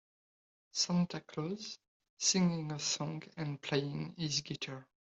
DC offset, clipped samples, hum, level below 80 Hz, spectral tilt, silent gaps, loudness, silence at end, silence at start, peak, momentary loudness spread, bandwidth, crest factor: under 0.1%; under 0.1%; none; -74 dBFS; -4 dB/octave; 1.88-2.00 s, 2.10-2.17 s; -36 LUFS; 0.35 s; 0.75 s; -16 dBFS; 12 LU; 8.2 kHz; 22 dB